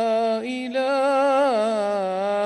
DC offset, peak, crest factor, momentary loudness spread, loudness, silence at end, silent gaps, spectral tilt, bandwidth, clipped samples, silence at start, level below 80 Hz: under 0.1%; -12 dBFS; 10 dB; 6 LU; -22 LUFS; 0 s; none; -4.5 dB/octave; 11.5 kHz; under 0.1%; 0 s; -70 dBFS